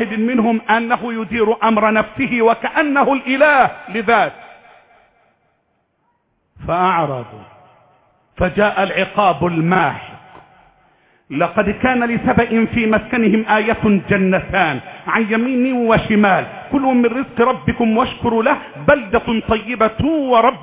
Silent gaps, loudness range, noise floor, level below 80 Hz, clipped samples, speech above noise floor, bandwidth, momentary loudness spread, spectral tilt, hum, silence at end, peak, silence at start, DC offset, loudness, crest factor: none; 7 LU; -65 dBFS; -42 dBFS; under 0.1%; 49 dB; 4 kHz; 6 LU; -10 dB/octave; none; 0 s; 0 dBFS; 0 s; under 0.1%; -16 LUFS; 16 dB